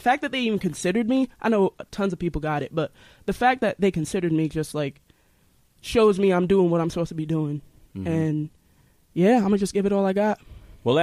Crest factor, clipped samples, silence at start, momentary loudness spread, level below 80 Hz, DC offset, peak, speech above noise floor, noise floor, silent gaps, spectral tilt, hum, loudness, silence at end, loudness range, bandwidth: 16 dB; under 0.1%; 0 s; 12 LU; -48 dBFS; under 0.1%; -6 dBFS; 38 dB; -61 dBFS; none; -6.5 dB/octave; none; -24 LUFS; 0 s; 2 LU; 15 kHz